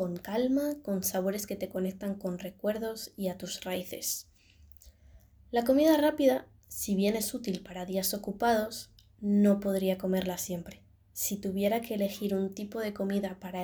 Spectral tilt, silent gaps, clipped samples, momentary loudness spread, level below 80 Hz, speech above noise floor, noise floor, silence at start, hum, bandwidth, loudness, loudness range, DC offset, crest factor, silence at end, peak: -5 dB/octave; none; under 0.1%; 12 LU; -60 dBFS; 27 dB; -58 dBFS; 0 s; none; over 20 kHz; -31 LUFS; 7 LU; under 0.1%; 18 dB; 0 s; -12 dBFS